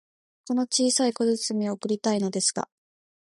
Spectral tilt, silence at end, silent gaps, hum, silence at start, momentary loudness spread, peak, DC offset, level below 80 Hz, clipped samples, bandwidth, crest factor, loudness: -3.5 dB/octave; 0.65 s; none; none; 0.45 s; 7 LU; -10 dBFS; under 0.1%; -74 dBFS; under 0.1%; 11.5 kHz; 16 dB; -25 LUFS